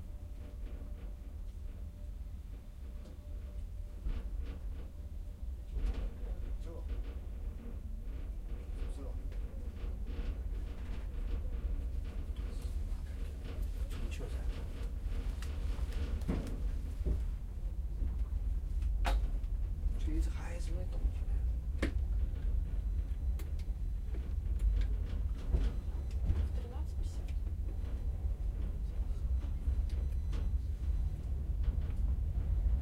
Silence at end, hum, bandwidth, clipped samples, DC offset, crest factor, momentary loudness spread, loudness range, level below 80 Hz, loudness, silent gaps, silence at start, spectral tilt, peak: 0 s; none; 11 kHz; under 0.1%; under 0.1%; 18 dB; 11 LU; 7 LU; -36 dBFS; -40 LUFS; none; 0 s; -7 dB/octave; -18 dBFS